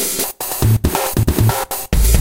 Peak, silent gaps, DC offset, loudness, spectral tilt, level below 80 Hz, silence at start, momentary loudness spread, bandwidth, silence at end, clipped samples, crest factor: 0 dBFS; none; under 0.1%; -17 LUFS; -4.5 dB/octave; -20 dBFS; 0 s; 5 LU; 17.5 kHz; 0 s; under 0.1%; 16 dB